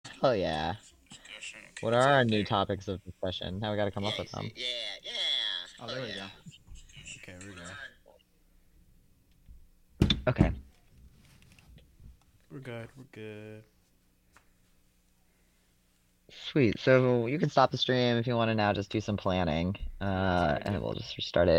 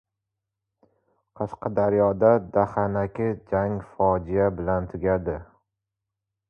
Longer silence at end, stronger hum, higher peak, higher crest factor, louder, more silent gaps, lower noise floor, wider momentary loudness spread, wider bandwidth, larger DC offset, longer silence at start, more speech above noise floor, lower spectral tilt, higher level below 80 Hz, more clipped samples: second, 0 s vs 1.05 s; neither; about the same, -8 dBFS vs -6 dBFS; about the same, 24 dB vs 20 dB; second, -29 LUFS vs -24 LUFS; neither; second, -68 dBFS vs -85 dBFS; first, 20 LU vs 11 LU; first, 14 kHz vs 5.4 kHz; neither; second, 0.05 s vs 1.4 s; second, 39 dB vs 61 dB; second, -6 dB/octave vs -11 dB/octave; about the same, -48 dBFS vs -46 dBFS; neither